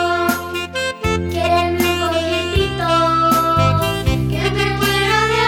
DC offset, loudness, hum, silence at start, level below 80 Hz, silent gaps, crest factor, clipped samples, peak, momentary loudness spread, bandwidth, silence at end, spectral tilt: under 0.1%; -17 LUFS; none; 0 s; -30 dBFS; none; 14 dB; under 0.1%; -2 dBFS; 6 LU; 20 kHz; 0 s; -5 dB/octave